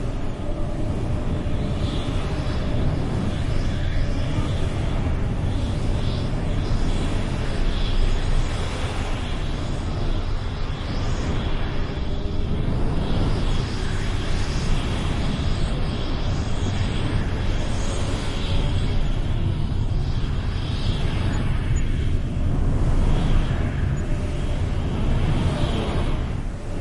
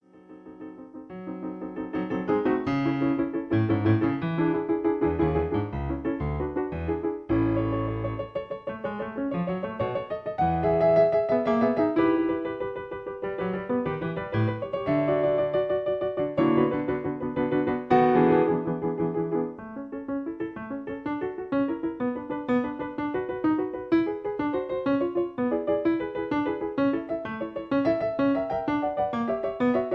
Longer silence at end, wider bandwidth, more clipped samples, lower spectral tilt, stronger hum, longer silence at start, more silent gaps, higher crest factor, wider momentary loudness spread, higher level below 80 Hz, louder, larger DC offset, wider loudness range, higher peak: about the same, 0 s vs 0 s; first, 11 kHz vs 5.8 kHz; neither; second, -6.5 dB/octave vs -9.5 dB/octave; neither; second, 0 s vs 0.15 s; neither; about the same, 14 dB vs 18 dB; second, 4 LU vs 11 LU; first, -24 dBFS vs -48 dBFS; about the same, -26 LUFS vs -27 LUFS; neither; about the same, 3 LU vs 5 LU; about the same, -8 dBFS vs -8 dBFS